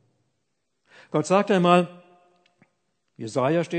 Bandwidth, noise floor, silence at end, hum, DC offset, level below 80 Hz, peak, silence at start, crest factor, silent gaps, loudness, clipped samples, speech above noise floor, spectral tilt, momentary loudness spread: 9 kHz; -78 dBFS; 0 s; none; under 0.1%; -78 dBFS; -2 dBFS; 1.15 s; 22 dB; none; -22 LUFS; under 0.1%; 57 dB; -6 dB/octave; 14 LU